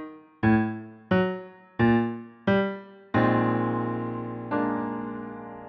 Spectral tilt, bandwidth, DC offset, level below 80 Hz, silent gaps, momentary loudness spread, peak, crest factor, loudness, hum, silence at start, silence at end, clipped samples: -6.5 dB/octave; 5.4 kHz; under 0.1%; -54 dBFS; none; 15 LU; -10 dBFS; 16 dB; -26 LUFS; none; 0 s; 0 s; under 0.1%